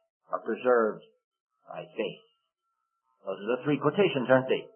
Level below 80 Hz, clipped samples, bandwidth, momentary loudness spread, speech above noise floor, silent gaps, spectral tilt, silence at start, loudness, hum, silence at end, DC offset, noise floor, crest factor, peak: -82 dBFS; under 0.1%; 3.3 kHz; 18 LU; 54 dB; 1.24-1.31 s, 1.40-1.46 s; -10 dB/octave; 0.3 s; -28 LUFS; none; 0.1 s; under 0.1%; -82 dBFS; 22 dB; -8 dBFS